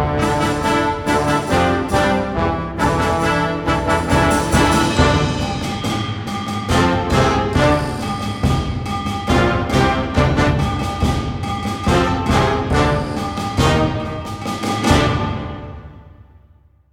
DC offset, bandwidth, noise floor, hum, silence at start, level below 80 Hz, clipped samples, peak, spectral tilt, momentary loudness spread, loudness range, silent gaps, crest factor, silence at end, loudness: under 0.1%; 18 kHz; -50 dBFS; none; 0 s; -30 dBFS; under 0.1%; -2 dBFS; -5.5 dB/octave; 8 LU; 2 LU; none; 16 dB; 0.8 s; -18 LUFS